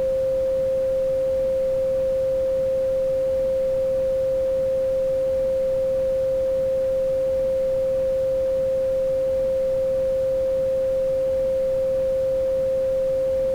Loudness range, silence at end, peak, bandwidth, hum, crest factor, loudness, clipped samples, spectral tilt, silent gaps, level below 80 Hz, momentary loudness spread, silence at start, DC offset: 0 LU; 0 s; -16 dBFS; 10.5 kHz; none; 6 dB; -22 LUFS; under 0.1%; -6.5 dB/octave; none; -44 dBFS; 0 LU; 0 s; under 0.1%